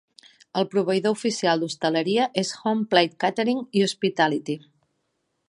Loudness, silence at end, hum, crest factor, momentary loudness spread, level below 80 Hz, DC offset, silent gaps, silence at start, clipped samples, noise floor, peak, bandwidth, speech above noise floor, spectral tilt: -23 LUFS; 0.9 s; none; 22 dB; 6 LU; -74 dBFS; under 0.1%; none; 0.55 s; under 0.1%; -75 dBFS; -2 dBFS; 11.5 kHz; 52 dB; -4.5 dB/octave